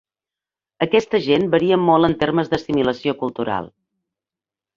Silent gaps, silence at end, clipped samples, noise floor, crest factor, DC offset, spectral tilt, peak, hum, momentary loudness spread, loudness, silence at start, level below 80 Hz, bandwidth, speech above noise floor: none; 1.1 s; under 0.1%; -89 dBFS; 18 dB; under 0.1%; -7 dB/octave; -2 dBFS; none; 9 LU; -19 LUFS; 0.8 s; -52 dBFS; 7.4 kHz; 71 dB